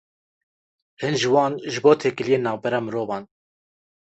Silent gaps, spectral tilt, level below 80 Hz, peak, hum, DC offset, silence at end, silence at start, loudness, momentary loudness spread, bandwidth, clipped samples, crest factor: none; -5 dB/octave; -64 dBFS; -4 dBFS; none; under 0.1%; 0.8 s; 1 s; -22 LUFS; 11 LU; 8.2 kHz; under 0.1%; 20 dB